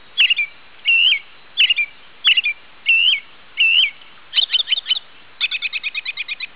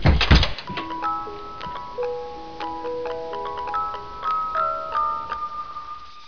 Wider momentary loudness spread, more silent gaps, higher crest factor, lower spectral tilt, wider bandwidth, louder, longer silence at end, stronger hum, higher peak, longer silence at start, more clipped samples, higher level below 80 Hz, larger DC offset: second, 11 LU vs 15 LU; neither; second, 14 dB vs 22 dB; second, 7 dB/octave vs -6 dB/octave; second, 4 kHz vs 5.4 kHz; first, -16 LUFS vs -25 LUFS; about the same, 0.1 s vs 0 s; neither; about the same, -4 dBFS vs -4 dBFS; first, 0.15 s vs 0 s; neither; second, -68 dBFS vs -30 dBFS; first, 0.7% vs under 0.1%